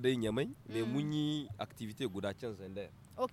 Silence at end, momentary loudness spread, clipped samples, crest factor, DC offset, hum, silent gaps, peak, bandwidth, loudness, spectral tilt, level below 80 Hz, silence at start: 0 s; 11 LU; under 0.1%; 18 dB; under 0.1%; none; none; -20 dBFS; 16 kHz; -39 LUFS; -6.5 dB/octave; -66 dBFS; 0 s